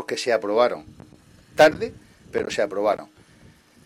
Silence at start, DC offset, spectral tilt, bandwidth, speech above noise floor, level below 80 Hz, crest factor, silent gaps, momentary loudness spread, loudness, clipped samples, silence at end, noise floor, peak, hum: 0 s; under 0.1%; -4 dB/octave; 15.5 kHz; 31 dB; -58 dBFS; 18 dB; none; 15 LU; -22 LUFS; under 0.1%; 0.8 s; -52 dBFS; -6 dBFS; none